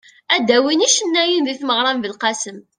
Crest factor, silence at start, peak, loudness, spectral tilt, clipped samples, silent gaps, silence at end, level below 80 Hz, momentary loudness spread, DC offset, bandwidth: 18 dB; 0.3 s; 0 dBFS; -16 LUFS; -1 dB/octave; under 0.1%; none; 0.15 s; -68 dBFS; 7 LU; under 0.1%; 10.5 kHz